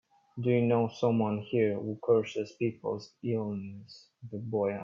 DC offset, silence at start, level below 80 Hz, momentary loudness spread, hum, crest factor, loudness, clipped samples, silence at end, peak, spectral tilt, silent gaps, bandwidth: under 0.1%; 0.35 s; -72 dBFS; 15 LU; none; 18 dB; -31 LUFS; under 0.1%; 0 s; -14 dBFS; -8 dB/octave; none; 7.4 kHz